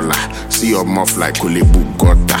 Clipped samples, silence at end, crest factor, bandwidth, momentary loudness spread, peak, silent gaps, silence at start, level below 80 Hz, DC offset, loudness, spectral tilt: under 0.1%; 0 s; 12 dB; 17 kHz; 5 LU; 0 dBFS; none; 0 s; -16 dBFS; under 0.1%; -14 LUFS; -4.5 dB/octave